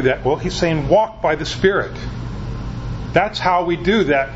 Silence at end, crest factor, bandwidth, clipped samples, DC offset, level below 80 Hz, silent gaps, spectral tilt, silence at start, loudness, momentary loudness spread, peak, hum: 0 s; 18 dB; 8 kHz; under 0.1%; under 0.1%; -34 dBFS; none; -6 dB/octave; 0 s; -19 LUFS; 12 LU; 0 dBFS; none